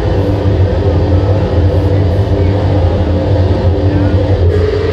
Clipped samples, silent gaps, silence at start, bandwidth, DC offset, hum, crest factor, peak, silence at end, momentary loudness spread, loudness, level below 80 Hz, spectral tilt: under 0.1%; none; 0 s; 6.2 kHz; under 0.1%; none; 10 dB; 0 dBFS; 0 s; 1 LU; -12 LUFS; -20 dBFS; -9 dB/octave